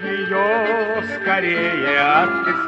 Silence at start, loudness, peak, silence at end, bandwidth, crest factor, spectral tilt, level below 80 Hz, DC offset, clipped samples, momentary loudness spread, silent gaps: 0 s; -18 LUFS; -2 dBFS; 0 s; 8.2 kHz; 16 dB; -6 dB/octave; -60 dBFS; under 0.1%; under 0.1%; 6 LU; none